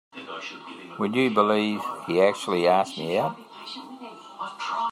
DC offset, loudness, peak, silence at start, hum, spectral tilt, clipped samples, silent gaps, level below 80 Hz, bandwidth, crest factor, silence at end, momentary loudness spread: under 0.1%; -24 LUFS; -6 dBFS; 0.15 s; none; -5 dB/octave; under 0.1%; none; -74 dBFS; 15.5 kHz; 20 dB; 0 s; 19 LU